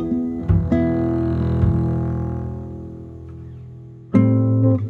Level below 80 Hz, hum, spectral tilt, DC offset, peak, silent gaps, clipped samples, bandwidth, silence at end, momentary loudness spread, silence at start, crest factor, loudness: -32 dBFS; none; -11.5 dB/octave; under 0.1%; -2 dBFS; none; under 0.1%; 4.3 kHz; 0 s; 20 LU; 0 s; 18 dB; -20 LUFS